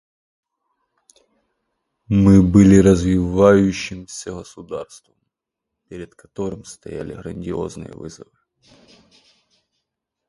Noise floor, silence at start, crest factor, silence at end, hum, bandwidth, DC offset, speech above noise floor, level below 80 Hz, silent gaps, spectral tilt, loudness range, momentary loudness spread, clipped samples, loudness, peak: -82 dBFS; 2.1 s; 20 dB; 2.05 s; none; 11.5 kHz; under 0.1%; 65 dB; -38 dBFS; none; -7.5 dB/octave; 18 LU; 25 LU; under 0.1%; -15 LUFS; 0 dBFS